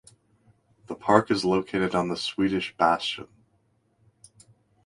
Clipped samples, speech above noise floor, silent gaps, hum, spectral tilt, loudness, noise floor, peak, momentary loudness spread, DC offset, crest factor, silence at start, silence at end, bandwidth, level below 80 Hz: under 0.1%; 43 dB; none; none; -5.5 dB/octave; -25 LUFS; -68 dBFS; 0 dBFS; 10 LU; under 0.1%; 28 dB; 0.9 s; 1.6 s; 11.5 kHz; -60 dBFS